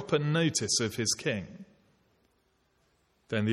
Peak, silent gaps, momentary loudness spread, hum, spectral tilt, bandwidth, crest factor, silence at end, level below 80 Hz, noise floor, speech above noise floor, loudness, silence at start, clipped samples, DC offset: -14 dBFS; none; 9 LU; none; -4 dB/octave; 14.5 kHz; 18 dB; 0 s; -66 dBFS; -72 dBFS; 42 dB; -29 LUFS; 0 s; under 0.1%; under 0.1%